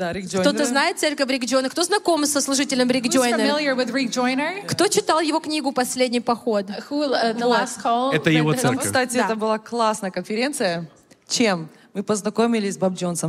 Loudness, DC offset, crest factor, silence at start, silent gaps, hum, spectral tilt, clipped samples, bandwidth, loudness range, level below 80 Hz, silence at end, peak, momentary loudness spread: -21 LUFS; under 0.1%; 18 dB; 0 s; none; none; -3.5 dB/octave; under 0.1%; 16 kHz; 3 LU; -64 dBFS; 0 s; -4 dBFS; 6 LU